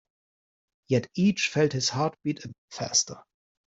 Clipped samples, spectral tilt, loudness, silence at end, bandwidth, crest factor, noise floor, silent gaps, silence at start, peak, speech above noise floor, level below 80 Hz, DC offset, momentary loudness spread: under 0.1%; -4 dB/octave; -26 LUFS; 0.55 s; 8.2 kHz; 18 dB; under -90 dBFS; 2.58-2.68 s; 0.9 s; -10 dBFS; over 63 dB; -64 dBFS; under 0.1%; 13 LU